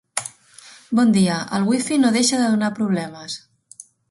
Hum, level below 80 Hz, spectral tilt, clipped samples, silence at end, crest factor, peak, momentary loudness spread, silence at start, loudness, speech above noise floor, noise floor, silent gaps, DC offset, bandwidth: none; -62 dBFS; -4.5 dB/octave; under 0.1%; 0.75 s; 18 dB; -4 dBFS; 16 LU; 0.15 s; -19 LUFS; 28 dB; -46 dBFS; none; under 0.1%; 11.5 kHz